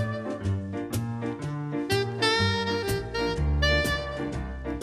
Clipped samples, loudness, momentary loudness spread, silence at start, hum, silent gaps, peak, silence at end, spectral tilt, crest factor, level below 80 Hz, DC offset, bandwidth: under 0.1%; -28 LUFS; 9 LU; 0 s; none; none; -10 dBFS; 0 s; -5 dB/octave; 18 dB; -36 dBFS; under 0.1%; 16 kHz